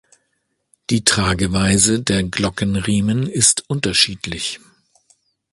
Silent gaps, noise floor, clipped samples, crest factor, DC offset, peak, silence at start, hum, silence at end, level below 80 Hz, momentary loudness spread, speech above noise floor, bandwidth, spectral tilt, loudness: none; -70 dBFS; under 0.1%; 20 dB; under 0.1%; 0 dBFS; 0.9 s; none; 0.95 s; -38 dBFS; 10 LU; 53 dB; 11.5 kHz; -3 dB/octave; -17 LUFS